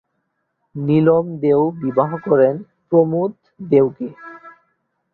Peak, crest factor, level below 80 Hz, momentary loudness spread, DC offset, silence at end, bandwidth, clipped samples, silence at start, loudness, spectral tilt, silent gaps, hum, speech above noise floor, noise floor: -2 dBFS; 16 dB; -60 dBFS; 16 LU; under 0.1%; 0.65 s; 4.3 kHz; under 0.1%; 0.75 s; -17 LUFS; -11.5 dB/octave; none; none; 55 dB; -71 dBFS